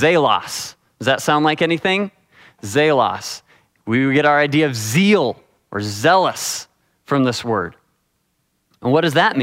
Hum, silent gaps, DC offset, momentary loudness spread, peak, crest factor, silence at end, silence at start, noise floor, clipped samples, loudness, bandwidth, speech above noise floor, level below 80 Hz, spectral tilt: none; none; under 0.1%; 14 LU; 0 dBFS; 18 dB; 0 s; 0 s; -68 dBFS; under 0.1%; -17 LUFS; 16 kHz; 51 dB; -60 dBFS; -4.5 dB/octave